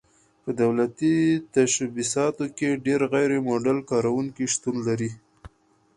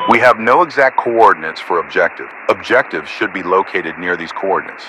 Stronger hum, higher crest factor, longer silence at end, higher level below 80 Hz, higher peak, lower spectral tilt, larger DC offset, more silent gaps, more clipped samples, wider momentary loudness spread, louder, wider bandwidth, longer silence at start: neither; about the same, 16 dB vs 14 dB; first, 0.5 s vs 0 s; about the same, -60 dBFS vs -56 dBFS; second, -8 dBFS vs 0 dBFS; about the same, -5 dB/octave vs -5 dB/octave; neither; neither; second, under 0.1% vs 0.4%; second, 5 LU vs 9 LU; second, -24 LUFS vs -14 LUFS; second, 11.5 kHz vs 13 kHz; first, 0.45 s vs 0 s